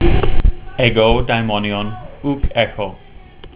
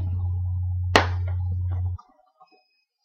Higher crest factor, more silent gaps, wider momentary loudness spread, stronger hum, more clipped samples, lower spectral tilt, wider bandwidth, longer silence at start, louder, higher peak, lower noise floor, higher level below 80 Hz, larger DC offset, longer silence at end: second, 14 dB vs 26 dB; neither; first, 12 LU vs 9 LU; neither; neither; first, -10 dB/octave vs -5.5 dB/octave; second, 4 kHz vs 9.6 kHz; about the same, 0 s vs 0 s; first, -18 LUFS vs -25 LUFS; about the same, 0 dBFS vs 0 dBFS; second, -37 dBFS vs -66 dBFS; first, -22 dBFS vs -40 dBFS; neither; second, 0.1 s vs 1.1 s